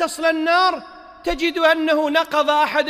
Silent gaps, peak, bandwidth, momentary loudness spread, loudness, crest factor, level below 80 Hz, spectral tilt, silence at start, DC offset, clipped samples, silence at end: none; -4 dBFS; 16 kHz; 9 LU; -18 LUFS; 14 dB; -44 dBFS; -2 dB/octave; 0 s; under 0.1%; under 0.1%; 0 s